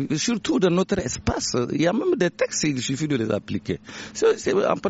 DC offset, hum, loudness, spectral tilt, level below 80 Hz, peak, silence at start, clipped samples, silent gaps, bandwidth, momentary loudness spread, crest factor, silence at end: under 0.1%; none; -23 LUFS; -5 dB/octave; -46 dBFS; -6 dBFS; 0 s; under 0.1%; none; 8 kHz; 8 LU; 16 dB; 0 s